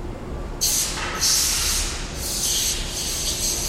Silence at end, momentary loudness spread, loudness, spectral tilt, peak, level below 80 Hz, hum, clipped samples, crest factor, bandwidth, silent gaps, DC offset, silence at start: 0 s; 10 LU; -21 LUFS; -1 dB/octave; -6 dBFS; -32 dBFS; none; under 0.1%; 18 dB; 16.5 kHz; none; under 0.1%; 0 s